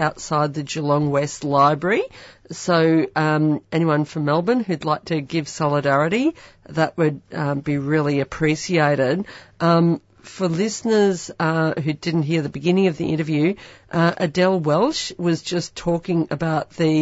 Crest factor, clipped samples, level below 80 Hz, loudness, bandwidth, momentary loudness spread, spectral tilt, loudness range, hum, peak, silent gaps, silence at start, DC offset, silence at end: 16 dB; under 0.1%; -54 dBFS; -20 LUFS; 8 kHz; 7 LU; -6 dB/octave; 2 LU; none; -4 dBFS; none; 0 s; under 0.1%; 0 s